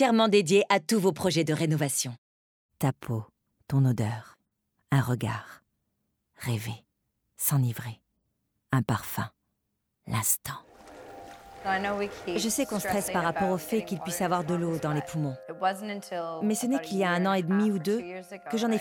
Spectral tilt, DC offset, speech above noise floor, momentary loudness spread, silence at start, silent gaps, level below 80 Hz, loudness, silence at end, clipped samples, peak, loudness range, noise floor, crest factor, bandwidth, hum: -5 dB/octave; under 0.1%; 53 dB; 14 LU; 0 s; 2.18-2.69 s; -62 dBFS; -28 LUFS; 0 s; under 0.1%; -8 dBFS; 4 LU; -80 dBFS; 20 dB; over 20 kHz; none